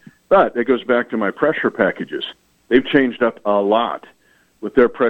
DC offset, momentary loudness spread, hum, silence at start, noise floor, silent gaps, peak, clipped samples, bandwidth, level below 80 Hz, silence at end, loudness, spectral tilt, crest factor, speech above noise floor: under 0.1%; 11 LU; none; 0.3 s; -53 dBFS; none; 0 dBFS; under 0.1%; 7.8 kHz; -52 dBFS; 0 s; -18 LUFS; -7.5 dB/octave; 18 dB; 36 dB